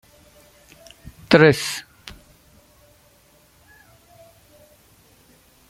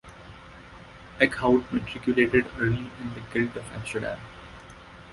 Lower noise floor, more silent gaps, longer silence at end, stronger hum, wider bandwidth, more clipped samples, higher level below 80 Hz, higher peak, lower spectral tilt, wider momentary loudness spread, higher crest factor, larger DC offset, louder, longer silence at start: first, -56 dBFS vs -46 dBFS; neither; first, 3.9 s vs 0 s; neither; first, 16 kHz vs 11.5 kHz; neither; second, -56 dBFS vs -50 dBFS; about the same, 0 dBFS vs -2 dBFS; second, -5 dB/octave vs -6.5 dB/octave; first, 30 LU vs 24 LU; about the same, 24 dB vs 26 dB; neither; first, -17 LUFS vs -26 LUFS; first, 1.3 s vs 0.05 s